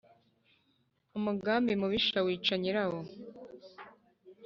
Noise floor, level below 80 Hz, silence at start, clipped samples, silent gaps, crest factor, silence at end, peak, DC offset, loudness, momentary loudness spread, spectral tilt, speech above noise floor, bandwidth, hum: -74 dBFS; -68 dBFS; 1.15 s; under 0.1%; none; 18 dB; 0 s; -16 dBFS; under 0.1%; -31 LUFS; 22 LU; -3 dB/octave; 43 dB; 7.2 kHz; none